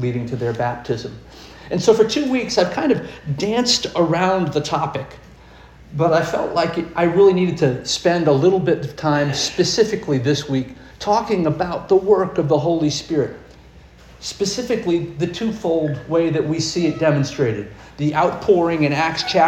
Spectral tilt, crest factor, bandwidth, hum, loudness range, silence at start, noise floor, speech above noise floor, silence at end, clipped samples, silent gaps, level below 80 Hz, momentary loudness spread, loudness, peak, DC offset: -5 dB/octave; 18 dB; 13 kHz; none; 4 LU; 0 s; -44 dBFS; 26 dB; 0 s; under 0.1%; none; -48 dBFS; 10 LU; -19 LUFS; -2 dBFS; under 0.1%